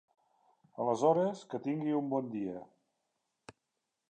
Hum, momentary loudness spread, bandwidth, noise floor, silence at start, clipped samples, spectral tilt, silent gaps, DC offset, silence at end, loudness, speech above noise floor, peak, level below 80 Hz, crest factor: none; 13 LU; 9.4 kHz; -86 dBFS; 0.75 s; under 0.1%; -7.5 dB/octave; none; under 0.1%; 1.45 s; -33 LUFS; 53 dB; -14 dBFS; -82 dBFS; 22 dB